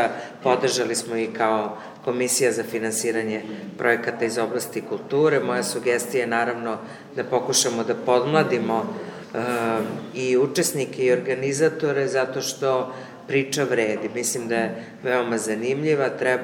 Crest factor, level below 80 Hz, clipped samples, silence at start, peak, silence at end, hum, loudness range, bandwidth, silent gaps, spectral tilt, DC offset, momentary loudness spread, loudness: 20 dB; -74 dBFS; under 0.1%; 0 s; -2 dBFS; 0 s; none; 1 LU; over 20 kHz; none; -3.5 dB/octave; under 0.1%; 9 LU; -23 LUFS